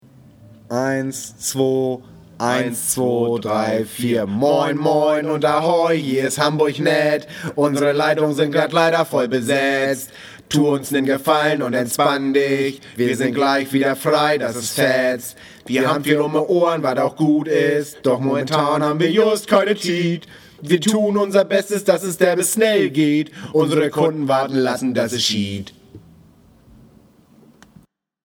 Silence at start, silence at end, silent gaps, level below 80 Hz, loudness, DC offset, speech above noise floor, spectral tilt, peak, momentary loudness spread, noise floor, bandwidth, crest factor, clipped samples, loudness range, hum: 0.7 s; 2.3 s; none; -62 dBFS; -18 LUFS; under 0.1%; 34 dB; -4.5 dB/octave; 0 dBFS; 7 LU; -52 dBFS; 18.5 kHz; 18 dB; under 0.1%; 3 LU; none